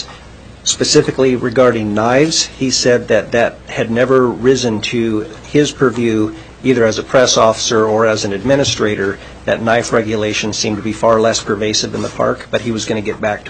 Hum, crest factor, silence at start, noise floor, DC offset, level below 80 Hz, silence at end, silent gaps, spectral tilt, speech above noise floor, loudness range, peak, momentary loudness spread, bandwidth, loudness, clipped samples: none; 14 dB; 0 s; -36 dBFS; 0.1%; -42 dBFS; 0 s; none; -4 dB/octave; 22 dB; 2 LU; 0 dBFS; 7 LU; 9.4 kHz; -14 LUFS; under 0.1%